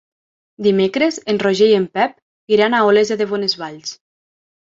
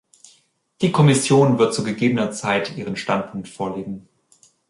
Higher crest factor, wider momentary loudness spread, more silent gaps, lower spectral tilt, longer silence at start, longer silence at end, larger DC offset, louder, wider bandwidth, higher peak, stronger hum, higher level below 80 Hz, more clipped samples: about the same, 16 dB vs 16 dB; second, 10 LU vs 15 LU; first, 2.22-2.47 s vs none; about the same, -4.5 dB/octave vs -5.5 dB/octave; second, 0.6 s vs 0.8 s; about the same, 0.75 s vs 0.7 s; neither; first, -16 LUFS vs -20 LUFS; second, 7.8 kHz vs 11.5 kHz; about the same, -2 dBFS vs -4 dBFS; neither; about the same, -62 dBFS vs -58 dBFS; neither